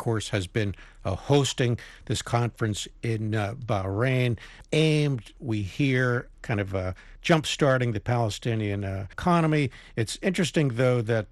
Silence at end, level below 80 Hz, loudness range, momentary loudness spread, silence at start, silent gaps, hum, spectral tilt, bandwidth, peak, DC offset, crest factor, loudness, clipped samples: 0.05 s; -50 dBFS; 2 LU; 9 LU; 0 s; none; none; -5.5 dB/octave; 12.5 kHz; -6 dBFS; under 0.1%; 20 dB; -26 LUFS; under 0.1%